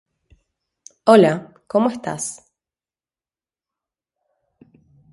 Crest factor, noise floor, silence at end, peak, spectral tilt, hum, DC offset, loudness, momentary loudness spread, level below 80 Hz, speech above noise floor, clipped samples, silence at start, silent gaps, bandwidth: 22 dB; under -90 dBFS; 2.8 s; 0 dBFS; -5.5 dB/octave; none; under 0.1%; -18 LUFS; 15 LU; -66 dBFS; over 74 dB; under 0.1%; 1.05 s; none; 11.5 kHz